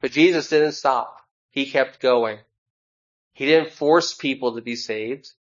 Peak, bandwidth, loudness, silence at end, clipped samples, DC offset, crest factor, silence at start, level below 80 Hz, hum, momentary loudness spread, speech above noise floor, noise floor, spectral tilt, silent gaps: -4 dBFS; 7.6 kHz; -21 LUFS; 0.25 s; under 0.1%; under 0.1%; 18 dB; 0.05 s; -74 dBFS; none; 13 LU; over 70 dB; under -90 dBFS; -4 dB/octave; 1.31-1.49 s, 2.58-3.31 s